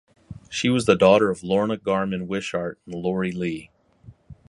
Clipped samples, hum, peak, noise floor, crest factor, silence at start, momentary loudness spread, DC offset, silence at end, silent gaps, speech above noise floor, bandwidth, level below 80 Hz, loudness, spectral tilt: under 0.1%; none; -2 dBFS; -50 dBFS; 22 dB; 0.3 s; 13 LU; under 0.1%; 0.15 s; none; 28 dB; 11.5 kHz; -54 dBFS; -22 LUFS; -5.5 dB/octave